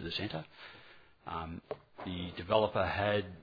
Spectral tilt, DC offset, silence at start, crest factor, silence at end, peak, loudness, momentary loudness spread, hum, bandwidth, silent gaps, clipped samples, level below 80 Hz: -7.5 dB/octave; under 0.1%; 0 s; 22 dB; 0 s; -14 dBFS; -35 LUFS; 21 LU; none; 5 kHz; none; under 0.1%; -58 dBFS